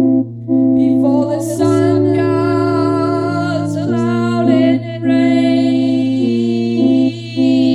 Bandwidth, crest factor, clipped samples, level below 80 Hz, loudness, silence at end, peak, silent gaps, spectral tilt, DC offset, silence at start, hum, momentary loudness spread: 12 kHz; 12 dB; under 0.1%; -62 dBFS; -14 LUFS; 0 s; 0 dBFS; none; -7.5 dB/octave; under 0.1%; 0 s; none; 5 LU